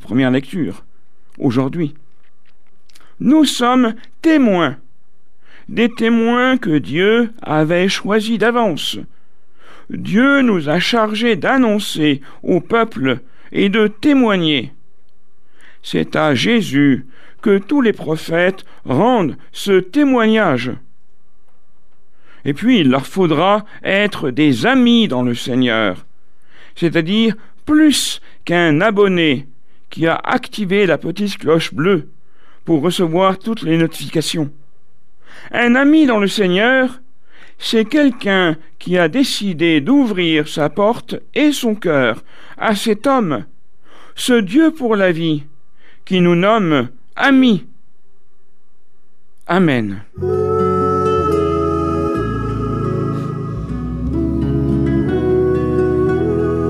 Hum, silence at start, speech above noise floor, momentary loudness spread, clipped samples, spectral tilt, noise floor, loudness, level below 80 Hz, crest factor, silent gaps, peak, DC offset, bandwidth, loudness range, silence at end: none; 0.05 s; 47 dB; 10 LU; under 0.1%; -5.5 dB/octave; -62 dBFS; -15 LUFS; -38 dBFS; 14 dB; none; -2 dBFS; 3%; 14.5 kHz; 3 LU; 0 s